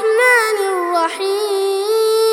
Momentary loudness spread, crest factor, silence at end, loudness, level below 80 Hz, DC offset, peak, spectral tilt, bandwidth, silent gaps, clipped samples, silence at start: 6 LU; 14 dB; 0 s; -15 LUFS; -74 dBFS; under 0.1%; 0 dBFS; 0.5 dB/octave; 17.5 kHz; none; under 0.1%; 0 s